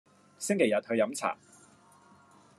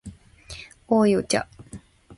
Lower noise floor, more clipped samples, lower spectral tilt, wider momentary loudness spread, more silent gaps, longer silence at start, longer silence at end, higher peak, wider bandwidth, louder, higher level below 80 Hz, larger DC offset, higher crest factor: first, -59 dBFS vs -45 dBFS; neither; about the same, -4 dB/octave vs -5 dB/octave; second, 11 LU vs 25 LU; neither; first, 0.4 s vs 0.05 s; first, 1.25 s vs 0.05 s; second, -12 dBFS vs -8 dBFS; first, 13 kHz vs 11.5 kHz; second, -30 LUFS vs -22 LUFS; second, -88 dBFS vs -52 dBFS; neither; about the same, 20 dB vs 18 dB